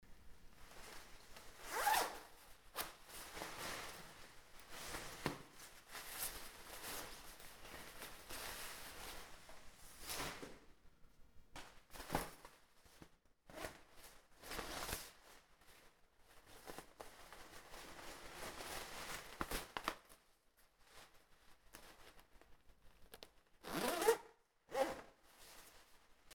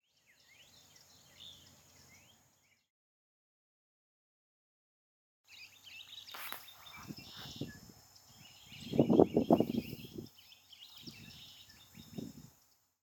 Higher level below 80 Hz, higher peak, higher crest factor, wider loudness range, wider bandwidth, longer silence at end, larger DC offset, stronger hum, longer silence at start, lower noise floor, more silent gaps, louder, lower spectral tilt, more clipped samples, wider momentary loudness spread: about the same, -64 dBFS vs -68 dBFS; second, -20 dBFS vs -8 dBFS; about the same, 30 dB vs 32 dB; second, 10 LU vs 24 LU; about the same, over 20 kHz vs 19 kHz; second, 0 s vs 0.6 s; neither; neither; second, 0 s vs 1.4 s; about the same, -73 dBFS vs -72 dBFS; second, none vs 2.90-5.44 s; second, -47 LUFS vs -35 LUFS; second, -2.5 dB/octave vs -6.5 dB/octave; neither; second, 22 LU vs 28 LU